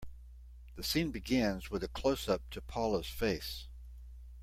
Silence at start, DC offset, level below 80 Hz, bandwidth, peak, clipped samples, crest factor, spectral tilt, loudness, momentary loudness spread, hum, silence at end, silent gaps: 0 s; under 0.1%; -48 dBFS; 16.5 kHz; -18 dBFS; under 0.1%; 18 dB; -5 dB/octave; -35 LUFS; 21 LU; none; 0 s; none